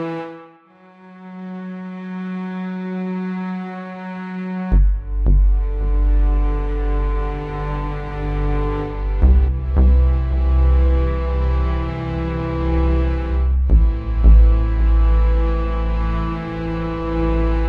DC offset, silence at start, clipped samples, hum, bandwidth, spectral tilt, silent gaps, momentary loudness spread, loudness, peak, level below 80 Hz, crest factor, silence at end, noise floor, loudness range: under 0.1%; 0 s; under 0.1%; none; 4.4 kHz; -10 dB/octave; none; 13 LU; -20 LUFS; 0 dBFS; -18 dBFS; 16 dB; 0 s; -48 dBFS; 10 LU